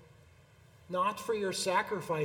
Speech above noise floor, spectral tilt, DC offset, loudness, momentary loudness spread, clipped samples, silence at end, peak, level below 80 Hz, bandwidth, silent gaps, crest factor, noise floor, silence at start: 28 dB; -3.5 dB/octave; under 0.1%; -33 LUFS; 4 LU; under 0.1%; 0 s; -16 dBFS; -70 dBFS; 19 kHz; none; 18 dB; -60 dBFS; 0 s